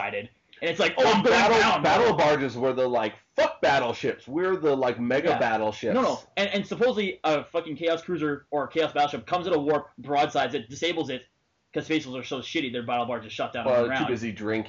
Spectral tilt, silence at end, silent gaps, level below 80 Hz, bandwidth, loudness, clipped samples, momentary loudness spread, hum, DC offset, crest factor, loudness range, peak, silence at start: -3 dB/octave; 0 s; none; -62 dBFS; 7.8 kHz; -25 LUFS; under 0.1%; 11 LU; none; under 0.1%; 12 dB; 6 LU; -14 dBFS; 0 s